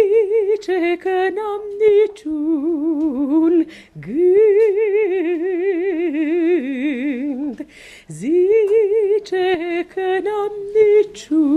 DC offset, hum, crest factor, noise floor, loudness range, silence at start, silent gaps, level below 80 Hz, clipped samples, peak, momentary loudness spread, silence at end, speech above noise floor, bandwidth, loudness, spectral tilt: under 0.1%; none; 12 dB; -39 dBFS; 3 LU; 0 s; none; -58 dBFS; under 0.1%; -4 dBFS; 10 LU; 0 s; 22 dB; 10.5 kHz; -18 LUFS; -6 dB/octave